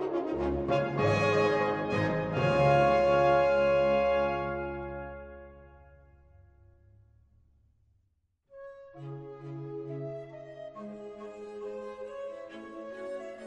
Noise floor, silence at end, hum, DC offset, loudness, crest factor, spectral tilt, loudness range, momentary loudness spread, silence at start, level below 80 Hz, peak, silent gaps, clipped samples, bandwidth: -74 dBFS; 0 s; none; under 0.1%; -28 LUFS; 18 dB; -7 dB/octave; 20 LU; 21 LU; 0 s; -52 dBFS; -12 dBFS; none; under 0.1%; 8.8 kHz